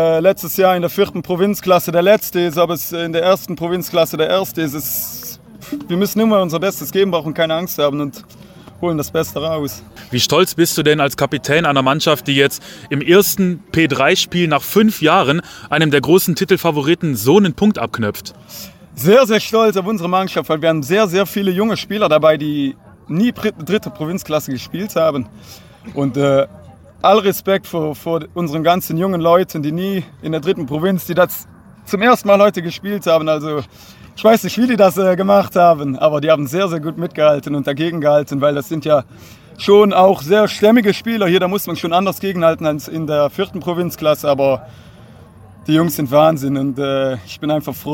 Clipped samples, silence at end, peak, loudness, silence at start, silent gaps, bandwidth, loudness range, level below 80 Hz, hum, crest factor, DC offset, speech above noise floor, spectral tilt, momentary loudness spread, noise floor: under 0.1%; 0 s; 0 dBFS; -15 LUFS; 0 s; none; 17 kHz; 4 LU; -50 dBFS; none; 14 dB; under 0.1%; 25 dB; -5 dB/octave; 11 LU; -41 dBFS